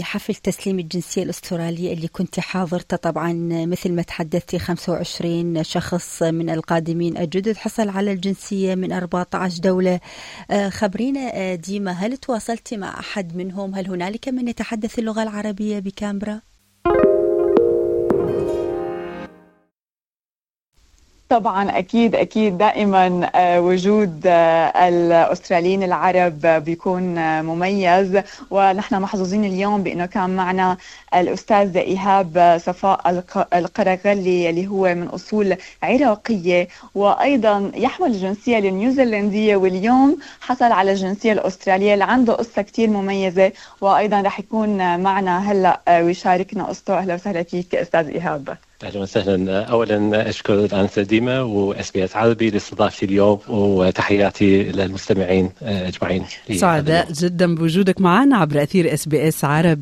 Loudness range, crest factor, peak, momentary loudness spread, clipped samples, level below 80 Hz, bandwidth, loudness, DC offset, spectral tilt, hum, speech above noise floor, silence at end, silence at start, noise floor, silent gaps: 7 LU; 16 dB; -2 dBFS; 10 LU; under 0.1%; -50 dBFS; 14.5 kHz; -19 LUFS; under 0.1%; -6 dB/octave; none; over 72 dB; 0 s; 0 s; under -90 dBFS; 20.07-20.11 s, 20.25-20.29 s